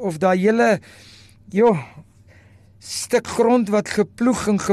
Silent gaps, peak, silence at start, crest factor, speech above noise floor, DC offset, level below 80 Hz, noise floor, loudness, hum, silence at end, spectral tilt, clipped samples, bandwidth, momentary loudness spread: none; -6 dBFS; 0 s; 14 dB; 30 dB; under 0.1%; -54 dBFS; -49 dBFS; -19 LUFS; none; 0 s; -5.5 dB/octave; under 0.1%; 13 kHz; 10 LU